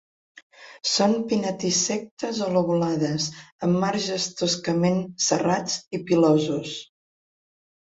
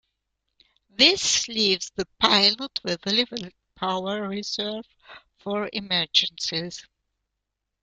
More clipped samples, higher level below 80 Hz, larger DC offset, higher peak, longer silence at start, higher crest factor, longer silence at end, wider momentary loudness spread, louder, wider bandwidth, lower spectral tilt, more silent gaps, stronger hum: neither; about the same, -64 dBFS vs -62 dBFS; neither; second, -6 dBFS vs -2 dBFS; second, 0.6 s vs 1 s; second, 18 dB vs 26 dB; about the same, 1 s vs 1 s; second, 8 LU vs 19 LU; about the same, -24 LUFS vs -22 LUFS; second, 8 kHz vs 12 kHz; first, -4.5 dB/octave vs -2 dB/octave; first, 2.11-2.17 s, 3.52-3.59 s, 5.87-5.91 s vs none; neither